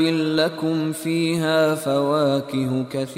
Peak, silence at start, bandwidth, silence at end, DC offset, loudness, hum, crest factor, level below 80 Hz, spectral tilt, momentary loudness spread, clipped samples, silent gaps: -8 dBFS; 0 s; 16 kHz; 0 s; under 0.1%; -21 LUFS; none; 14 dB; -64 dBFS; -5.5 dB/octave; 5 LU; under 0.1%; none